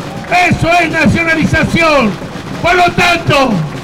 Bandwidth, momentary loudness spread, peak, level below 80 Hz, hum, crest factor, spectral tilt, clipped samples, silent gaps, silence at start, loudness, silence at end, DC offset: 16.5 kHz; 6 LU; -4 dBFS; -30 dBFS; none; 8 dB; -5 dB/octave; under 0.1%; none; 0 s; -10 LUFS; 0 s; under 0.1%